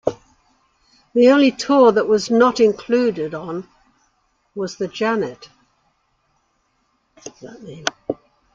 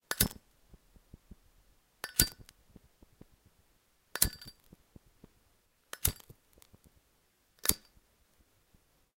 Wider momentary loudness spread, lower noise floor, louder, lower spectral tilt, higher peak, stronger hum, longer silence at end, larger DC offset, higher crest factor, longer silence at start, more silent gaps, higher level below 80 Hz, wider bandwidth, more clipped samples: about the same, 23 LU vs 23 LU; second, -66 dBFS vs -72 dBFS; first, -18 LUFS vs -32 LUFS; first, -5 dB/octave vs -2 dB/octave; about the same, 0 dBFS vs 0 dBFS; neither; second, 0.4 s vs 1.4 s; neither; second, 20 dB vs 40 dB; about the same, 0.05 s vs 0.1 s; neither; second, -60 dBFS vs -50 dBFS; second, 7.8 kHz vs 17 kHz; neither